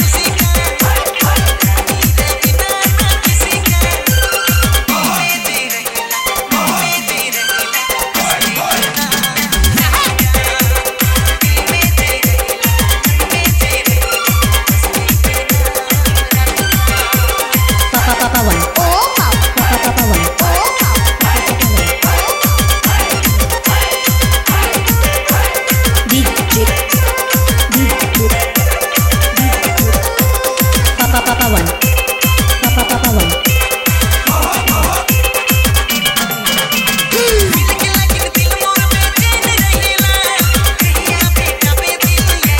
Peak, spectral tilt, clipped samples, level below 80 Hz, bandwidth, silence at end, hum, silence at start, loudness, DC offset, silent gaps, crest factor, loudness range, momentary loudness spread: 0 dBFS; -3.5 dB/octave; under 0.1%; -18 dBFS; 17 kHz; 0 s; none; 0 s; -11 LUFS; under 0.1%; none; 12 dB; 1 LU; 2 LU